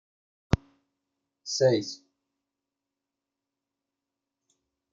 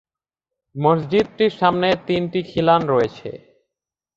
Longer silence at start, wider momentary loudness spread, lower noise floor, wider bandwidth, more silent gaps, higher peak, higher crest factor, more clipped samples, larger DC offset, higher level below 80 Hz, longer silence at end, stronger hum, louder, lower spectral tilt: second, 0.5 s vs 0.75 s; first, 19 LU vs 10 LU; about the same, -88 dBFS vs -86 dBFS; about the same, 7.8 kHz vs 7.6 kHz; neither; second, -6 dBFS vs -2 dBFS; first, 28 dB vs 18 dB; neither; neither; about the same, -50 dBFS vs -54 dBFS; first, 3 s vs 0.8 s; neither; second, -27 LUFS vs -19 LUFS; second, -5 dB/octave vs -7.5 dB/octave